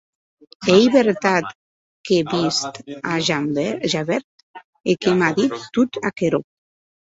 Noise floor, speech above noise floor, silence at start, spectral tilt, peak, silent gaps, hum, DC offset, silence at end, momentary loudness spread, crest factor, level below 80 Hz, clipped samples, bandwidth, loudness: under -90 dBFS; over 71 dB; 0.6 s; -5 dB/octave; -2 dBFS; 1.55-2.04 s, 4.24-4.54 s, 4.64-4.73 s; none; under 0.1%; 0.7 s; 10 LU; 18 dB; -58 dBFS; under 0.1%; 8 kHz; -19 LUFS